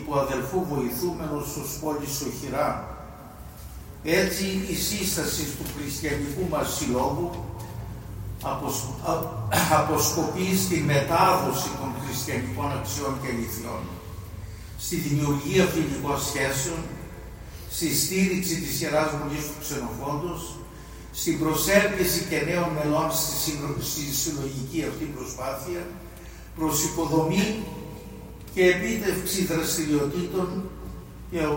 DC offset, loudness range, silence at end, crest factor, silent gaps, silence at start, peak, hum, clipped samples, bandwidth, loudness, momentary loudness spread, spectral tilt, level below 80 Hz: under 0.1%; 6 LU; 0 s; 22 dB; none; 0 s; -4 dBFS; none; under 0.1%; 16.5 kHz; -26 LUFS; 17 LU; -4 dB/octave; -44 dBFS